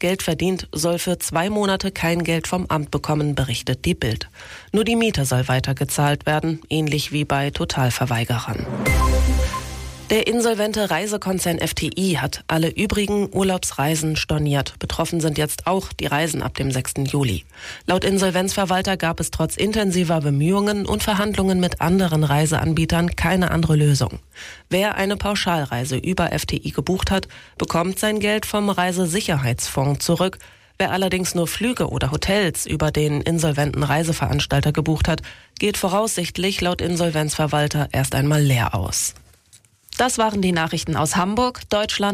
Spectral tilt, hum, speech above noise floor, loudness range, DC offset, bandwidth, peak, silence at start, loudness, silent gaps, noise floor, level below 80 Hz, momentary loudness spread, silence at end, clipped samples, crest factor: -5 dB/octave; none; 33 dB; 3 LU; under 0.1%; 15.5 kHz; -8 dBFS; 0 s; -21 LUFS; none; -54 dBFS; -34 dBFS; 5 LU; 0 s; under 0.1%; 12 dB